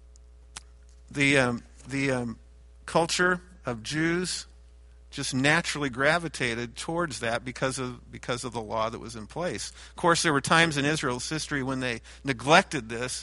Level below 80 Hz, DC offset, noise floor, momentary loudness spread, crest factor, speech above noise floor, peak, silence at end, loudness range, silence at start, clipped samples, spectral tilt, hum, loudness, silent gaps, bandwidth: -52 dBFS; under 0.1%; -51 dBFS; 16 LU; 24 dB; 24 dB; -4 dBFS; 0 s; 5 LU; 0.1 s; under 0.1%; -4 dB/octave; none; -27 LUFS; none; 11.5 kHz